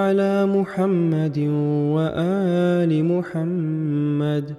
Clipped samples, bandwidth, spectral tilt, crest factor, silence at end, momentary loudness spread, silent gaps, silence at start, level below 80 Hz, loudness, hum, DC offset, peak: under 0.1%; 10 kHz; -9 dB/octave; 12 dB; 0 s; 4 LU; none; 0 s; -60 dBFS; -21 LUFS; none; under 0.1%; -8 dBFS